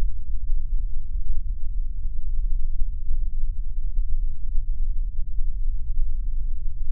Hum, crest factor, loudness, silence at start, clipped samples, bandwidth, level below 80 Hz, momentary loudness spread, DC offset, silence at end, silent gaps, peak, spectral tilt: none; 10 dB; -33 LUFS; 0 s; under 0.1%; 0.3 kHz; -22 dBFS; 3 LU; under 0.1%; 0 s; none; -8 dBFS; -15 dB/octave